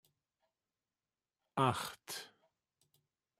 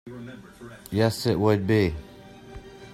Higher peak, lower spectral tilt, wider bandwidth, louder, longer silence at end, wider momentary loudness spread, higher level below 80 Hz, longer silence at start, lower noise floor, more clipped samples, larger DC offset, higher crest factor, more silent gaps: second, -18 dBFS vs -6 dBFS; second, -4.5 dB/octave vs -6.5 dB/octave; about the same, 16 kHz vs 15.5 kHz; second, -38 LUFS vs -24 LUFS; first, 1.15 s vs 0 s; second, 12 LU vs 23 LU; second, -78 dBFS vs -48 dBFS; first, 1.55 s vs 0.05 s; first, under -90 dBFS vs -44 dBFS; neither; neither; first, 26 dB vs 20 dB; neither